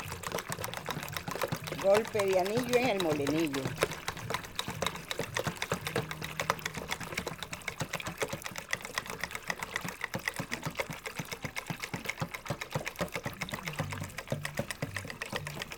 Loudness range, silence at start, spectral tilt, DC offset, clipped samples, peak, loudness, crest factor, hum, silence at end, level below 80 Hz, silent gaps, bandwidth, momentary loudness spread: 7 LU; 0 s; -4 dB/octave; under 0.1%; under 0.1%; -10 dBFS; -35 LUFS; 26 dB; none; 0 s; -58 dBFS; none; over 20 kHz; 9 LU